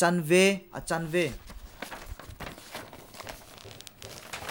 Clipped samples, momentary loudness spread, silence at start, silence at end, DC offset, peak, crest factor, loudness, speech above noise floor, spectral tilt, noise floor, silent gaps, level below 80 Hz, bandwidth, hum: under 0.1%; 23 LU; 0 s; 0 s; under 0.1%; -8 dBFS; 22 dB; -27 LUFS; 22 dB; -4.5 dB/octave; -48 dBFS; none; -52 dBFS; 19.5 kHz; none